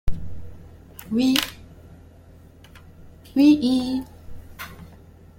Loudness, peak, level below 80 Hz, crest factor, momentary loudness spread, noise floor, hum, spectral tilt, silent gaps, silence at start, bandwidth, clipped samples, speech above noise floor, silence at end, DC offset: -21 LUFS; -2 dBFS; -40 dBFS; 22 dB; 28 LU; -48 dBFS; none; -4.5 dB/octave; none; 0.05 s; 16.5 kHz; under 0.1%; 29 dB; 0.5 s; under 0.1%